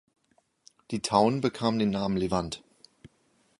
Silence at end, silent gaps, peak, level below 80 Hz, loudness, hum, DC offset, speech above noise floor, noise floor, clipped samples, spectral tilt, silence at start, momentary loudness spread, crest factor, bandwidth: 1 s; none; -8 dBFS; -56 dBFS; -27 LUFS; none; under 0.1%; 43 dB; -70 dBFS; under 0.1%; -5.5 dB/octave; 0.9 s; 13 LU; 22 dB; 11.5 kHz